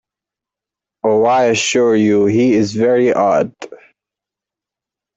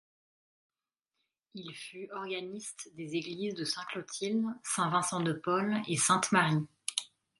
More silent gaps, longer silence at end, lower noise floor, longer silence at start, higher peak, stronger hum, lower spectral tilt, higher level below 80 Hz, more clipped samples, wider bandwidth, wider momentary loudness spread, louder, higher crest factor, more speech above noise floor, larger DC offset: neither; first, 1.4 s vs 0.35 s; about the same, -86 dBFS vs -89 dBFS; second, 1.05 s vs 1.55 s; first, -2 dBFS vs -10 dBFS; neither; first, -5 dB/octave vs -3.5 dB/octave; first, -58 dBFS vs -78 dBFS; neither; second, 8.4 kHz vs 11.5 kHz; second, 9 LU vs 16 LU; first, -14 LUFS vs -32 LUFS; second, 12 dB vs 24 dB; first, 73 dB vs 56 dB; neither